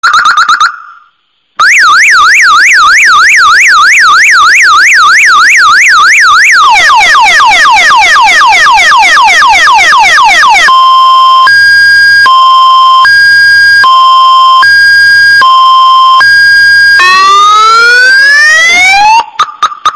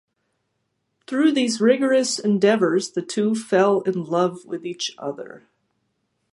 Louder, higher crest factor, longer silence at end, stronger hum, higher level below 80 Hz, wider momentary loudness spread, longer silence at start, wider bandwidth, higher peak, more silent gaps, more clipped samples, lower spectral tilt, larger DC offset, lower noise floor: first, -1 LUFS vs -21 LUFS; second, 2 dB vs 18 dB; second, 0 s vs 0.95 s; neither; first, -40 dBFS vs -74 dBFS; second, 1 LU vs 14 LU; second, 0.05 s vs 1.1 s; first, 17 kHz vs 11.5 kHz; first, 0 dBFS vs -4 dBFS; neither; neither; second, 1.5 dB/octave vs -4.5 dB/octave; neither; second, -52 dBFS vs -74 dBFS